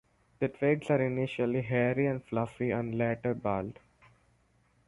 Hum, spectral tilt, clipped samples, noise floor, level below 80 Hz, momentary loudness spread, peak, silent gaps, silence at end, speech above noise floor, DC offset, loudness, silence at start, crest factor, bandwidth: none; -8.5 dB/octave; under 0.1%; -69 dBFS; -62 dBFS; 7 LU; -14 dBFS; none; 1.15 s; 38 dB; under 0.1%; -31 LUFS; 0.4 s; 18 dB; 11.5 kHz